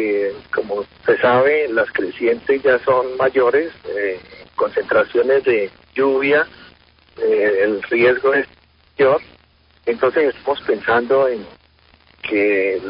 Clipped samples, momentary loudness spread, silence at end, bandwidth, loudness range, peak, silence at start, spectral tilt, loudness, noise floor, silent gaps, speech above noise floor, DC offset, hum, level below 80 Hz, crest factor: under 0.1%; 10 LU; 0 s; 5.4 kHz; 2 LU; -4 dBFS; 0 s; -10 dB/octave; -17 LUFS; -54 dBFS; none; 37 dB; under 0.1%; none; -54 dBFS; 14 dB